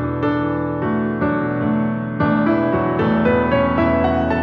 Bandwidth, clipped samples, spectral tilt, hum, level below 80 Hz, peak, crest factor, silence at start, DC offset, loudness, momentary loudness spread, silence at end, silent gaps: 5.8 kHz; under 0.1%; -10 dB/octave; none; -38 dBFS; -4 dBFS; 14 dB; 0 s; under 0.1%; -18 LUFS; 4 LU; 0 s; none